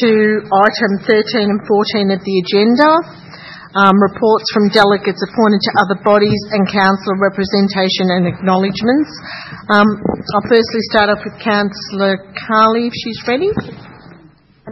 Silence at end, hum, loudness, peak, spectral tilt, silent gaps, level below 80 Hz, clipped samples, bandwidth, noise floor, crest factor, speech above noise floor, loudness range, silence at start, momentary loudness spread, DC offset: 0 s; none; -13 LUFS; 0 dBFS; -6.5 dB/octave; none; -50 dBFS; under 0.1%; 6.8 kHz; -46 dBFS; 14 dB; 32 dB; 3 LU; 0 s; 9 LU; under 0.1%